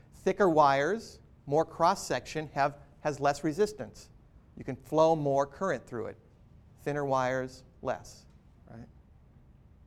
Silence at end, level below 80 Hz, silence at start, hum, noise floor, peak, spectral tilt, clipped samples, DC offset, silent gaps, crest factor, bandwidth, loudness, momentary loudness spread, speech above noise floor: 1 s; -58 dBFS; 0.25 s; none; -57 dBFS; -10 dBFS; -5.5 dB/octave; under 0.1%; under 0.1%; none; 20 dB; 15 kHz; -30 LUFS; 18 LU; 28 dB